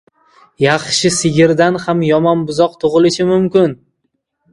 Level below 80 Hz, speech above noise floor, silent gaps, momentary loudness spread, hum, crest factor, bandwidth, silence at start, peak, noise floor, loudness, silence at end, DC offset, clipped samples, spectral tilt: -50 dBFS; 56 dB; none; 4 LU; none; 14 dB; 11.5 kHz; 0.6 s; 0 dBFS; -69 dBFS; -13 LUFS; 0.8 s; under 0.1%; under 0.1%; -5 dB/octave